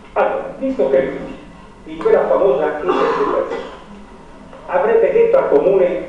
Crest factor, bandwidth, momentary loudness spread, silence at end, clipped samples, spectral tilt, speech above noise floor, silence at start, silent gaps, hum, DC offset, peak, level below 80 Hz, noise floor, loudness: 16 dB; 7.8 kHz; 20 LU; 0 s; under 0.1%; -7 dB/octave; 23 dB; 0.05 s; none; none; under 0.1%; -2 dBFS; -46 dBFS; -38 dBFS; -16 LUFS